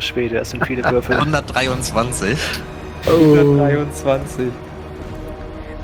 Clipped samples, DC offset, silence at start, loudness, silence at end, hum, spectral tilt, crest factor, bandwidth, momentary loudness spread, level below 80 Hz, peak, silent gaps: under 0.1%; under 0.1%; 0 s; -17 LUFS; 0 s; none; -5.5 dB/octave; 16 dB; over 20 kHz; 19 LU; -36 dBFS; -2 dBFS; none